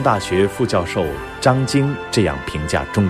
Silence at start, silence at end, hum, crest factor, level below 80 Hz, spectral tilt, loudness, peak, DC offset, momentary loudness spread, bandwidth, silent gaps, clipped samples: 0 s; 0 s; none; 16 dB; -38 dBFS; -5.5 dB/octave; -19 LUFS; -2 dBFS; under 0.1%; 5 LU; 14.5 kHz; none; under 0.1%